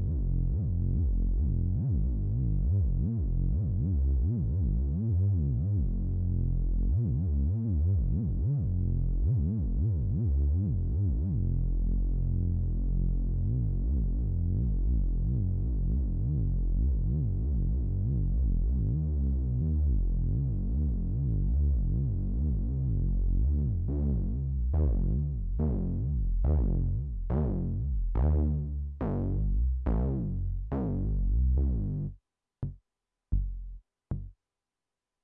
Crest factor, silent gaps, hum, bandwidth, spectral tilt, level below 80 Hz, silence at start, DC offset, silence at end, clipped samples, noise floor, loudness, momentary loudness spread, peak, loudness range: 12 dB; none; none; 1.9 kHz; -14 dB/octave; -30 dBFS; 0 s; under 0.1%; 0.9 s; under 0.1%; under -90 dBFS; -30 LUFS; 4 LU; -16 dBFS; 2 LU